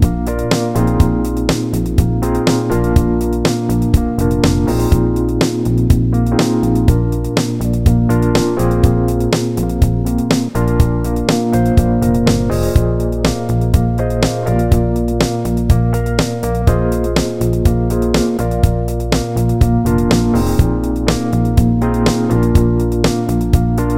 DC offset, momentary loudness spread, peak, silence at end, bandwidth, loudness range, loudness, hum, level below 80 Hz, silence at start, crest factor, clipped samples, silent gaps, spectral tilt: under 0.1%; 4 LU; 0 dBFS; 0 s; 16.5 kHz; 1 LU; -15 LUFS; none; -20 dBFS; 0 s; 14 dB; under 0.1%; none; -6.5 dB/octave